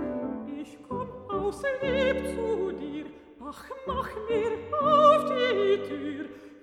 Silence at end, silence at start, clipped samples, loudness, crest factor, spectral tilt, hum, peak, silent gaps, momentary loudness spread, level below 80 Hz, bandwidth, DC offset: 0.05 s; 0 s; under 0.1%; -27 LUFS; 20 dB; -5.5 dB/octave; none; -8 dBFS; none; 20 LU; -52 dBFS; 13.5 kHz; under 0.1%